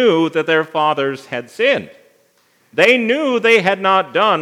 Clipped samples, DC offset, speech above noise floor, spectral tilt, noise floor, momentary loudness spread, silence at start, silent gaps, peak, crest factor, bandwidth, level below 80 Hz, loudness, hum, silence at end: under 0.1%; under 0.1%; 42 dB; -4.5 dB/octave; -57 dBFS; 9 LU; 0 s; none; 0 dBFS; 16 dB; 13 kHz; -76 dBFS; -15 LUFS; none; 0 s